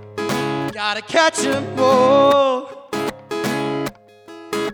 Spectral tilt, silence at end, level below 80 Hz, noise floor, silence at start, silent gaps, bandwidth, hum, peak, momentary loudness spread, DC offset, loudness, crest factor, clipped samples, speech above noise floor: -4 dB/octave; 0 s; -58 dBFS; -41 dBFS; 0 s; none; over 20 kHz; none; -2 dBFS; 13 LU; under 0.1%; -18 LUFS; 16 dB; under 0.1%; 26 dB